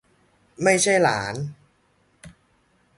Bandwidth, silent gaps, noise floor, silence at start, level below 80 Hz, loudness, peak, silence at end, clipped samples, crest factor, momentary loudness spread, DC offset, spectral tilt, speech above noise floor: 11.5 kHz; none; -64 dBFS; 0.6 s; -60 dBFS; -21 LUFS; -4 dBFS; 0.7 s; under 0.1%; 22 dB; 15 LU; under 0.1%; -3.5 dB/octave; 43 dB